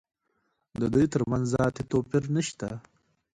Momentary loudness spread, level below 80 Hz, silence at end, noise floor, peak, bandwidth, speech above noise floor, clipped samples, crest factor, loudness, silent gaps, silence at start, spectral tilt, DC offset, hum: 13 LU; -52 dBFS; 0.55 s; -75 dBFS; -10 dBFS; 11 kHz; 49 dB; under 0.1%; 18 dB; -28 LUFS; none; 0.8 s; -6.5 dB/octave; under 0.1%; none